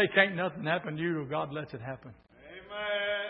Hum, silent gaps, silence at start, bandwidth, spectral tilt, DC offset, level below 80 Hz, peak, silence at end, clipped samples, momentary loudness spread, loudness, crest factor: none; none; 0 s; 5.4 kHz; -3 dB/octave; under 0.1%; -68 dBFS; -8 dBFS; 0 s; under 0.1%; 18 LU; -31 LUFS; 24 dB